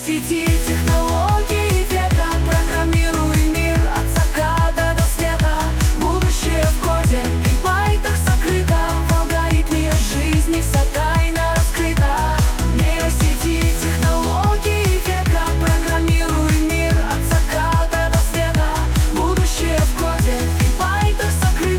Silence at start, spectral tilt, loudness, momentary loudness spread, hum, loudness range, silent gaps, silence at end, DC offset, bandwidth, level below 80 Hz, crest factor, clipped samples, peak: 0 s; -5 dB/octave; -18 LUFS; 1 LU; none; 0 LU; none; 0 s; under 0.1%; 18 kHz; -20 dBFS; 10 dB; under 0.1%; -6 dBFS